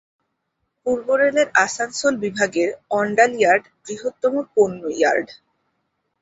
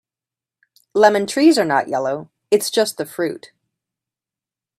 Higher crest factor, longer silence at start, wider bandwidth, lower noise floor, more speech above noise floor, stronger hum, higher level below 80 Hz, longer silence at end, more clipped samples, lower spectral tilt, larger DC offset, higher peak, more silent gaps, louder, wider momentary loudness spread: about the same, 20 dB vs 20 dB; about the same, 0.85 s vs 0.95 s; second, 8 kHz vs 15.5 kHz; second, -74 dBFS vs -89 dBFS; second, 55 dB vs 72 dB; neither; first, -62 dBFS vs -70 dBFS; second, 0.9 s vs 1.4 s; neither; about the same, -3.5 dB/octave vs -4 dB/octave; neither; about the same, -2 dBFS vs 0 dBFS; neither; about the same, -19 LUFS vs -18 LUFS; about the same, 9 LU vs 11 LU